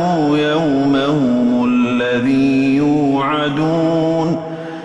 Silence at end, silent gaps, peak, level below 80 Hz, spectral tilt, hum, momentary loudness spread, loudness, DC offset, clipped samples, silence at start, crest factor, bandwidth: 0 s; none; -6 dBFS; -48 dBFS; -7 dB/octave; none; 3 LU; -15 LUFS; under 0.1%; under 0.1%; 0 s; 10 dB; 8.4 kHz